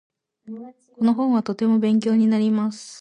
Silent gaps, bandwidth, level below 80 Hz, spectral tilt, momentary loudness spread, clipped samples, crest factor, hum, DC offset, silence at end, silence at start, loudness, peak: none; 10 kHz; -70 dBFS; -7 dB/octave; 20 LU; under 0.1%; 12 dB; none; under 0.1%; 0 s; 0.45 s; -20 LUFS; -8 dBFS